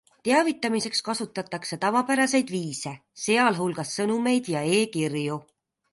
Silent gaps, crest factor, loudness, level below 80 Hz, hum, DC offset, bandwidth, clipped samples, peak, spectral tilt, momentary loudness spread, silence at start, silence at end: none; 18 dB; -25 LUFS; -72 dBFS; none; under 0.1%; 11.5 kHz; under 0.1%; -8 dBFS; -4 dB/octave; 10 LU; 0.25 s; 0.5 s